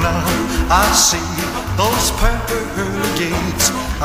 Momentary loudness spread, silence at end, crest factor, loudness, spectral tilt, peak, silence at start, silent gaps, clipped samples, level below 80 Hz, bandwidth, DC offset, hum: 9 LU; 0 s; 16 dB; -16 LUFS; -3 dB/octave; 0 dBFS; 0 s; none; under 0.1%; -24 dBFS; 16 kHz; under 0.1%; none